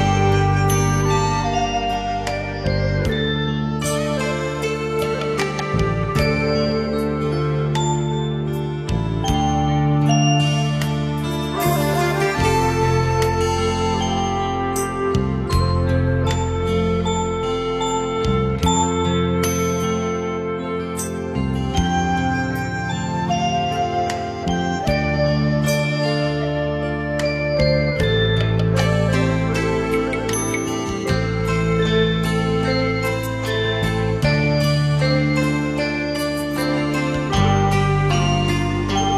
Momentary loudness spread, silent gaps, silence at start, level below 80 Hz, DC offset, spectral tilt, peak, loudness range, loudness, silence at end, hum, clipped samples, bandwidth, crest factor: 5 LU; none; 0 s; -32 dBFS; under 0.1%; -5.5 dB/octave; -4 dBFS; 3 LU; -20 LUFS; 0 s; none; under 0.1%; 15 kHz; 14 dB